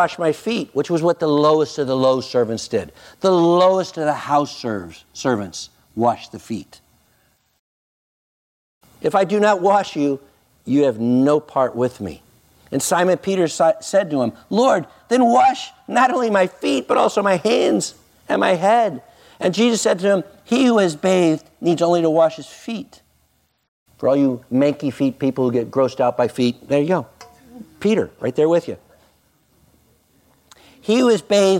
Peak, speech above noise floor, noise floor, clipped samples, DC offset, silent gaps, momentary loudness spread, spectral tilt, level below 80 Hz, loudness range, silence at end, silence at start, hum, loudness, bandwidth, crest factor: -4 dBFS; 45 dB; -63 dBFS; under 0.1%; under 0.1%; 7.59-8.81 s, 23.68-23.86 s; 13 LU; -5 dB/octave; -62 dBFS; 6 LU; 0 s; 0 s; none; -18 LUFS; 16 kHz; 16 dB